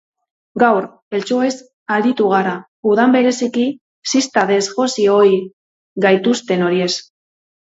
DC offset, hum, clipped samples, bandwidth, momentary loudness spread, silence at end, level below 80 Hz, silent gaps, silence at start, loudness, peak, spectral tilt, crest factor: under 0.1%; none; under 0.1%; 8 kHz; 11 LU; 0.75 s; -66 dBFS; 1.02-1.11 s, 1.73-1.86 s, 2.68-2.83 s, 3.81-4.02 s, 5.53-5.96 s; 0.55 s; -16 LUFS; 0 dBFS; -4.5 dB/octave; 16 dB